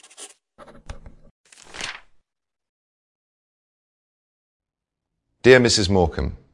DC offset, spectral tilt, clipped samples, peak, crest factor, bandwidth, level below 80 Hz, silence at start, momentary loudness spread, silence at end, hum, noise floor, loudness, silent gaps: under 0.1%; -4.5 dB/octave; under 0.1%; 0 dBFS; 24 dB; 11.5 kHz; -42 dBFS; 0.2 s; 27 LU; 0.15 s; none; -82 dBFS; -17 LUFS; 1.31-1.44 s, 2.69-4.60 s